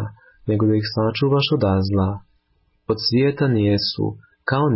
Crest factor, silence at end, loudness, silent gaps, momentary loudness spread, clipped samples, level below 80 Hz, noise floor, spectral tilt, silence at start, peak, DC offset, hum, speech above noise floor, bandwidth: 12 dB; 0 s; -20 LUFS; none; 12 LU; under 0.1%; -42 dBFS; -64 dBFS; -10 dB/octave; 0 s; -8 dBFS; under 0.1%; none; 45 dB; 5.8 kHz